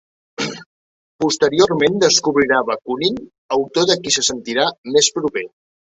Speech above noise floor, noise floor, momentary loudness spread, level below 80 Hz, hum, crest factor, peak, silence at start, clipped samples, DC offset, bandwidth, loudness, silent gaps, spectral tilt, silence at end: over 73 dB; under -90 dBFS; 12 LU; -56 dBFS; none; 18 dB; 0 dBFS; 0.4 s; under 0.1%; under 0.1%; 8.4 kHz; -17 LUFS; 0.66-1.19 s, 3.38-3.49 s, 4.78-4.84 s; -2.5 dB/octave; 0.5 s